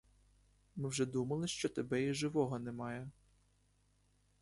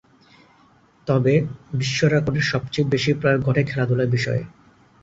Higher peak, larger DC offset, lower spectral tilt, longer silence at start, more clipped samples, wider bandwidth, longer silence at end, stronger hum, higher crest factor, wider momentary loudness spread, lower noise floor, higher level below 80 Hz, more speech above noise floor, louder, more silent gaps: second, -22 dBFS vs -4 dBFS; neither; about the same, -5 dB/octave vs -6 dB/octave; second, 0.75 s vs 1.05 s; neither; first, 11.5 kHz vs 7.8 kHz; first, 1.3 s vs 0.55 s; first, 50 Hz at -60 dBFS vs none; about the same, 20 dB vs 18 dB; about the same, 10 LU vs 8 LU; first, -74 dBFS vs -55 dBFS; second, -68 dBFS vs -50 dBFS; about the same, 36 dB vs 35 dB; second, -39 LUFS vs -21 LUFS; neither